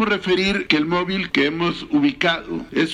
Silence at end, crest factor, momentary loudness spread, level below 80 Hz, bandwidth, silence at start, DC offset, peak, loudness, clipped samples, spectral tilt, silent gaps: 0 s; 20 dB; 5 LU; -48 dBFS; 10 kHz; 0 s; under 0.1%; 0 dBFS; -20 LUFS; under 0.1%; -5.5 dB/octave; none